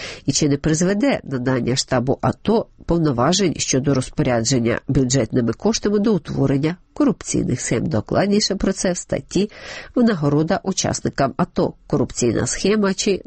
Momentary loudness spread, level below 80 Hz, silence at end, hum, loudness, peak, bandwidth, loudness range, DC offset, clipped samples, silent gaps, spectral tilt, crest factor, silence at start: 4 LU; -40 dBFS; 0.05 s; none; -19 LUFS; -6 dBFS; 8.8 kHz; 2 LU; under 0.1%; under 0.1%; none; -5 dB/octave; 14 dB; 0 s